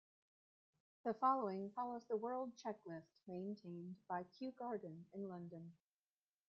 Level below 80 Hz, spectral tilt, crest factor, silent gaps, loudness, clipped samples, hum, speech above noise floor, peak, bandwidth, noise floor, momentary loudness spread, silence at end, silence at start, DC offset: under -90 dBFS; -6.5 dB/octave; 22 dB; none; -46 LUFS; under 0.1%; none; over 44 dB; -24 dBFS; 7.2 kHz; under -90 dBFS; 15 LU; 0.75 s; 1.05 s; under 0.1%